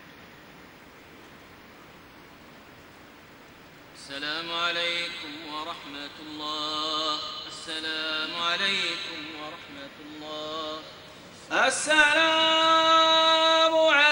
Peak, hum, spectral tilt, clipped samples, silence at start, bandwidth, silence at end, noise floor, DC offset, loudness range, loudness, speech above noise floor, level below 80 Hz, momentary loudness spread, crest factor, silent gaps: -6 dBFS; none; -1 dB/octave; under 0.1%; 0 s; 16 kHz; 0 s; -50 dBFS; under 0.1%; 11 LU; -24 LUFS; 23 dB; -66 dBFS; 20 LU; 22 dB; none